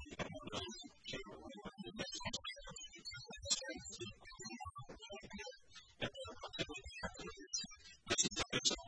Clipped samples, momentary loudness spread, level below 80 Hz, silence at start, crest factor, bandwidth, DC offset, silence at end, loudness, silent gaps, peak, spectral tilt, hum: under 0.1%; 16 LU; -64 dBFS; 0 s; 26 dB; 10.5 kHz; under 0.1%; 0 s; -44 LUFS; none; -20 dBFS; -1.5 dB/octave; none